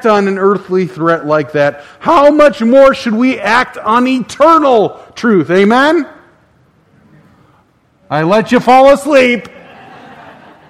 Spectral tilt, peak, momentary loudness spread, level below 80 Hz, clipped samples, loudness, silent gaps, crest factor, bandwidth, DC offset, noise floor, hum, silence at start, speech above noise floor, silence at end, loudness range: -6 dB/octave; 0 dBFS; 9 LU; -46 dBFS; 0.7%; -10 LUFS; none; 10 dB; 13 kHz; under 0.1%; -51 dBFS; none; 0 s; 42 dB; 1.2 s; 5 LU